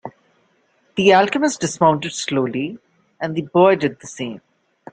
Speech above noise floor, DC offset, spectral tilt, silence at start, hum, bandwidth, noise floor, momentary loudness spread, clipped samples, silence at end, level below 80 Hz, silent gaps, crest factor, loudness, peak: 44 dB; under 0.1%; -4.5 dB/octave; 0.05 s; none; 9.4 kHz; -61 dBFS; 16 LU; under 0.1%; 0.55 s; -60 dBFS; none; 18 dB; -18 LUFS; -2 dBFS